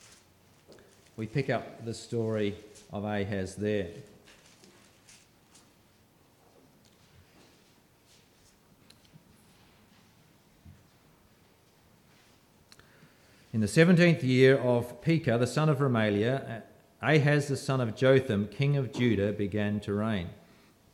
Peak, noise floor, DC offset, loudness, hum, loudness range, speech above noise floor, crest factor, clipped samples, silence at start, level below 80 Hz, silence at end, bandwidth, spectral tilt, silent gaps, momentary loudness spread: -8 dBFS; -63 dBFS; under 0.1%; -28 LUFS; none; 12 LU; 36 dB; 24 dB; under 0.1%; 0.7 s; -66 dBFS; 0.6 s; 14.5 kHz; -6.5 dB/octave; none; 17 LU